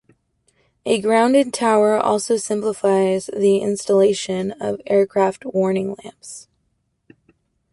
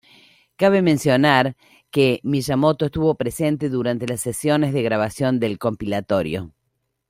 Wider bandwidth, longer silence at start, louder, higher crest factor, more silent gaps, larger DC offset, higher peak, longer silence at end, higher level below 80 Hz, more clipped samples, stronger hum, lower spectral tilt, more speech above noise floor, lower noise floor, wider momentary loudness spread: second, 11.5 kHz vs 16 kHz; first, 0.85 s vs 0.6 s; about the same, -18 LUFS vs -20 LUFS; about the same, 16 dB vs 18 dB; neither; neither; about the same, -4 dBFS vs -2 dBFS; first, 1.3 s vs 0.6 s; second, -62 dBFS vs -52 dBFS; neither; neither; about the same, -5 dB/octave vs -6 dB/octave; about the same, 51 dB vs 54 dB; second, -69 dBFS vs -74 dBFS; first, 13 LU vs 8 LU